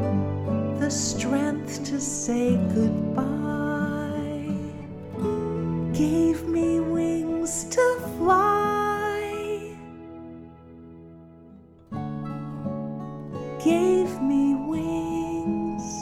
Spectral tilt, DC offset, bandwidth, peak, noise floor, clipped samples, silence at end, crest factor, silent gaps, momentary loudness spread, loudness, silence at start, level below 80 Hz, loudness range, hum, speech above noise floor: -5.5 dB/octave; under 0.1%; 16 kHz; -10 dBFS; -49 dBFS; under 0.1%; 0 s; 16 dB; none; 14 LU; -25 LUFS; 0 s; -50 dBFS; 12 LU; none; 25 dB